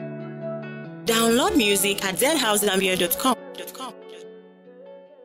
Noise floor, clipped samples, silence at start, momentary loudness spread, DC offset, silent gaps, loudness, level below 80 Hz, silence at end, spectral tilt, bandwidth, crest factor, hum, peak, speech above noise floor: -46 dBFS; under 0.1%; 0 s; 18 LU; under 0.1%; none; -21 LUFS; -54 dBFS; 0.2 s; -2.5 dB/octave; 16.5 kHz; 16 dB; none; -8 dBFS; 25 dB